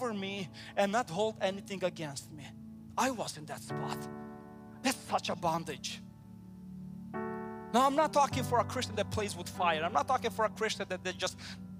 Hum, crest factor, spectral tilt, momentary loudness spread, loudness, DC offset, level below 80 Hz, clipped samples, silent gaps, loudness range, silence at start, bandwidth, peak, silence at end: none; 20 dB; -4 dB/octave; 18 LU; -34 LUFS; under 0.1%; -64 dBFS; under 0.1%; none; 7 LU; 0 s; 15.5 kHz; -14 dBFS; 0 s